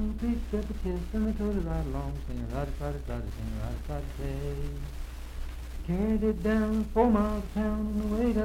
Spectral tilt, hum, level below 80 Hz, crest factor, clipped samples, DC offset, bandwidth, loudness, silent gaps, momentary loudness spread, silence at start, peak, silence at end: -8 dB/octave; none; -36 dBFS; 20 dB; under 0.1%; under 0.1%; 16 kHz; -31 LUFS; none; 13 LU; 0 s; -10 dBFS; 0 s